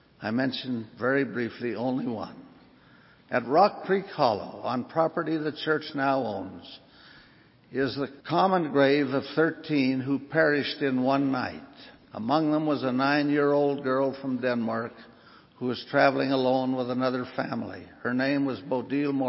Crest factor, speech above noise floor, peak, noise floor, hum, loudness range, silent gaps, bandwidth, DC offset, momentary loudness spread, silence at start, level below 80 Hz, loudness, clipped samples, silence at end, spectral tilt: 20 dB; 30 dB; -8 dBFS; -57 dBFS; none; 5 LU; none; 5.8 kHz; under 0.1%; 11 LU; 0.2 s; -68 dBFS; -27 LUFS; under 0.1%; 0 s; -10 dB/octave